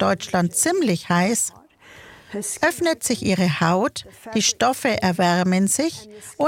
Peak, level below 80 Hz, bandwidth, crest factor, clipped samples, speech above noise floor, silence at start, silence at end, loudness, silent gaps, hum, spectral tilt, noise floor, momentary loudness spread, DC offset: -4 dBFS; -56 dBFS; 17 kHz; 16 dB; under 0.1%; 26 dB; 0 s; 0 s; -20 LUFS; none; none; -4 dB/octave; -46 dBFS; 9 LU; under 0.1%